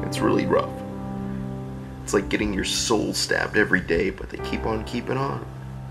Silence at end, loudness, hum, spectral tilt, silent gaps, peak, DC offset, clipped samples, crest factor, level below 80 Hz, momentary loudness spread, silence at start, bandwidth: 0 s; -25 LUFS; none; -4.5 dB/octave; none; -4 dBFS; under 0.1%; under 0.1%; 20 dB; -40 dBFS; 12 LU; 0 s; 15.5 kHz